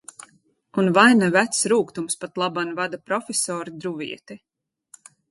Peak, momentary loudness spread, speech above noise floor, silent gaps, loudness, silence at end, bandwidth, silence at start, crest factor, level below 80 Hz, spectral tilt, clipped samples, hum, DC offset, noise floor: -2 dBFS; 17 LU; 39 dB; none; -21 LUFS; 0.95 s; 12 kHz; 0.75 s; 20 dB; -70 dBFS; -3.5 dB/octave; under 0.1%; none; under 0.1%; -60 dBFS